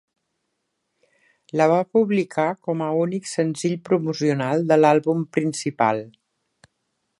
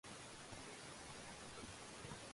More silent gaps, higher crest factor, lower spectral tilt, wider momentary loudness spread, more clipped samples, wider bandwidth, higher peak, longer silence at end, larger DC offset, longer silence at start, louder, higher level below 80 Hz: neither; about the same, 20 dB vs 16 dB; first, -6 dB/octave vs -3 dB/octave; first, 8 LU vs 1 LU; neither; about the same, 11.5 kHz vs 11.5 kHz; first, -4 dBFS vs -38 dBFS; first, 1.1 s vs 0 s; neither; first, 1.55 s vs 0.05 s; first, -21 LUFS vs -53 LUFS; about the same, -72 dBFS vs -70 dBFS